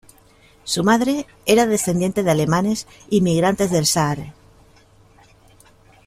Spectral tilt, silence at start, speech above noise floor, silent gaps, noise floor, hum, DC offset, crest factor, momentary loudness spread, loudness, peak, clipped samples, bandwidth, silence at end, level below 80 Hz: -4.5 dB/octave; 0.65 s; 33 dB; none; -52 dBFS; none; under 0.1%; 18 dB; 8 LU; -19 LUFS; -2 dBFS; under 0.1%; 16 kHz; 1.75 s; -50 dBFS